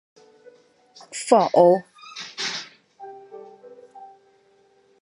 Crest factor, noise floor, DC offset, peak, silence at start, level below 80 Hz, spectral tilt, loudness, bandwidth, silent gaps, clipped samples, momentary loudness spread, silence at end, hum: 24 dB; -59 dBFS; under 0.1%; -2 dBFS; 1.1 s; -80 dBFS; -4.5 dB/octave; -20 LUFS; 11.5 kHz; none; under 0.1%; 27 LU; 1 s; none